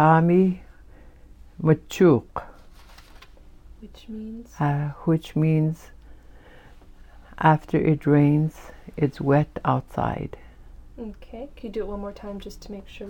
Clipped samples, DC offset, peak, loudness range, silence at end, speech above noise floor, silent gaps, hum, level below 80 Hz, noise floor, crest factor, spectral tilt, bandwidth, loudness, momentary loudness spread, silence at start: under 0.1%; under 0.1%; -4 dBFS; 7 LU; 0 s; 25 dB; none; none; -46 dBFS; -47 dBFS; 20 dB; -8.5 dB/octave; 17 kHz; -22 LUFS; 20 LU; 0 s